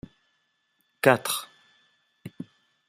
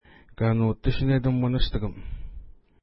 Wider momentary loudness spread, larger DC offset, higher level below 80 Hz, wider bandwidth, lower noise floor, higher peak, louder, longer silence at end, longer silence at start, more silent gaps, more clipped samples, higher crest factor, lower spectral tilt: first, 25 LU vs 18 LU; neither; second, -68 dBFS vs -32 dBFS; first, 15.5 kHz vs 5.8 kHz; first, -73 dBFS vs -43 dBFS; first, -2 dBFS vs -8 dBFS; about the same, -24 LUFS vs -25 LUFS; first, 0.45 s vs 0.3 s; first, 1.05 s vs 0.4 s; neither; neither; first, 28 dB vs 16 dB; second, -4 dB/octave vs -11.5 dB/octave